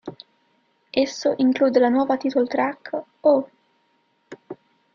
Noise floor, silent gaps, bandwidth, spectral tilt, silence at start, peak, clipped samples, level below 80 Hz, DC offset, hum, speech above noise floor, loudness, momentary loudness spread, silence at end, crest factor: -66 dBFS; none; 7.2 kHz; -4.5 dB/octave; 0.05 s; -4 dBFS; under 0.1%; -66 dBFS; under 0.1%; none; 46 dB; -21 LUFS; 22 LU; 0.4 s; 18 dB